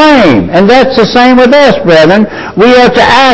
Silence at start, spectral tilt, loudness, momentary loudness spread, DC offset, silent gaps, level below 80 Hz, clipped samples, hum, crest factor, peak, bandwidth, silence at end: 0 s; -5.5 dB/octave; -4 LUFS; 3 LU; under 0.1%; none; -32 dBFS; 10%; none; 4 dB; 0 dBFS; 8 kHz; 0 s